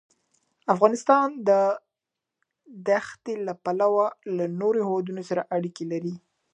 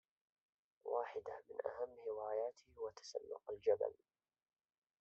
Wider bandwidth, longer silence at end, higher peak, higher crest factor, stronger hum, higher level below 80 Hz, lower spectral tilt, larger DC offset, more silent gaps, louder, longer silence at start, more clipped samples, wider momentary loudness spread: first, 9.6 kHz vs 7.6 kHz; second, 0.35 s vs 1.05 s; first, -4 dBFS vs -24 dBFS; about the same, 22 dB vs 22 dB; neither; about the same, -80 dBFS vs -84 dBFS; first, -6.5 dB/octave vs -2 dB/octave; neither; neither; first, -25 LUFS vs -45 LUFS; second, 0.7 s vs 0.85 s; neither; about the same, 13 LU vs 11 LU